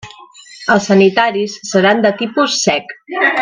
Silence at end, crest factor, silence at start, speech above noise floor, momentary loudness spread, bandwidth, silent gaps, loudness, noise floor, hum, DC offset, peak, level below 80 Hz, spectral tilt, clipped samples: 0 s; 14 dB; 0.05 s; 25 dB; 10 LU; 10 kHz; none; -13 LUFS; -39 dBFS; none; under 0.1%; 0 dBFS; -56 dBFS; -4 dB/octave; under 0.1%